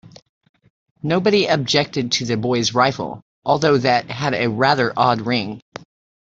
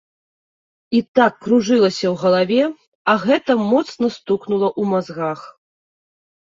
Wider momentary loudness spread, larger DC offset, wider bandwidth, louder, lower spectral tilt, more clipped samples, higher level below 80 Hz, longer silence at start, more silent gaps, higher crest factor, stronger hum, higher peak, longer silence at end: first, 14 LU vs 8 LU; neither; about the same, 7.8 kHz vs 7.6 kHz; about the same, -18 LUFS vs -18 LUFS; second, -4.5 dB/octave vs -6 dB/octave; neither; first, -56 dBFS vs -62 dBFS; first, 1.05 s vs 0.9 s; about the same, 3.22-3.42 s vs 1.08-1.14 s, 2.87-3.05 s; about the same, 18 dB vs 18 dB; neither; about the same, -2 dBFS vs 0 dBFS; second, 0.65 s vs 1.1 s